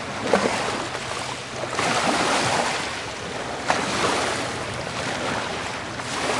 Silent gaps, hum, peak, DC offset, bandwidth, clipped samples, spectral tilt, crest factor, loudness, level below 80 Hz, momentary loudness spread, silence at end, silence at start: none; none; -2 dBFS; under 0.1%; 11.5 kHz; under 0.1%; -3 dB/octave; 22 dB; -24 LUFS; -52 dBFS; 9 LU; 0 s; 0 s